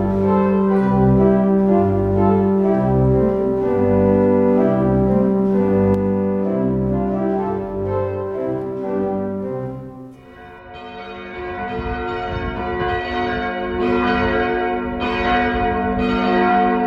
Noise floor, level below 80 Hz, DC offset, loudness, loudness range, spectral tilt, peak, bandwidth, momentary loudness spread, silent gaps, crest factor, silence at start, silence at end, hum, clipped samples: -39 dBFS; -36 dBFS; under 0.1%; -18 LUFS; 11 LU; -9.5 dB/octave; -2 dBFS; 5.6 kHz; 11 LU; none; 16 dB; 0 s; 0 s; none; under 0.1%